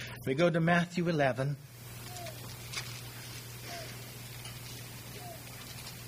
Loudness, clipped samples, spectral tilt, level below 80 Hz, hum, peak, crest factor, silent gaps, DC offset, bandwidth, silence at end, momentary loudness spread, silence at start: -35 LUFS; under 0.1%; -5.5 dB/octave; -60 dBFS; none; -12 dBFS; 22 dB; none; under 0.1%; 15.5 kHz; 0 s; 16 LU; 0 s